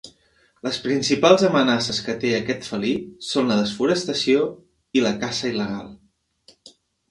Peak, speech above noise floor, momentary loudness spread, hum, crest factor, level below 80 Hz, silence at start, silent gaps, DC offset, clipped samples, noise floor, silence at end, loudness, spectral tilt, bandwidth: 0 dBFS; 40 dB; 12 LU; none; 22 dB; -58 dBFS; 0.05 s; none; under 0.1%; under 0.1%; -61 dBFS; 0.4 s; -21 LUFS; -4.5 dB/octave; 11.5 kHz